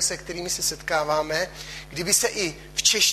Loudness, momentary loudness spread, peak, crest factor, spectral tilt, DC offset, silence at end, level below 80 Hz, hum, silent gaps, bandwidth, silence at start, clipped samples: -23 LUFS; 11 LU; -6 dBFS; 20 dB; -1 dB/octave; under 0.1%; 0 s; -48 dBFS; none; none; 14.5 kHz; 0 s; under 0.1%